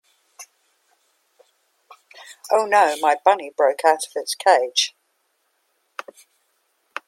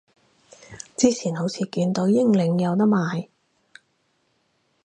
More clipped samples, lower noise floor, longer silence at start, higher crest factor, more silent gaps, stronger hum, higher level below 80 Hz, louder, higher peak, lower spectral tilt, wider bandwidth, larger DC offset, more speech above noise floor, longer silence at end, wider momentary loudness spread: neither; about the same, -69 dBFS vs -69 dBFS; second, 0.4 s vs 0.7 s; about the same, 22 dB vs 20 dB; neither; neither; second, -80 dBFS vs -66 dBFS; first, -19 LUFS vs -22 LUFS; first, 0 dBFS vs -4 dBFS; second, 0 dB/octave vs -6 dB/octave; first, 16 kHz vs 10.5 kHz; neither; about the same, 51 dB vs 48 dB; first, 2.2 s vs 1.6 s; first, 21 LU vs 14 LU